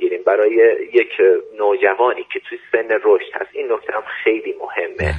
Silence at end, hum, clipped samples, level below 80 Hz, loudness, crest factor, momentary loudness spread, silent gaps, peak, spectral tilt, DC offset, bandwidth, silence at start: 0 s; none; under 0.1%; -44 dBFS; -17 LUFS; 16 dB; 11 LU; none; 0 dBFS; -7.5 dB/octave; under 0.1%; 8.2 kHz; 0 s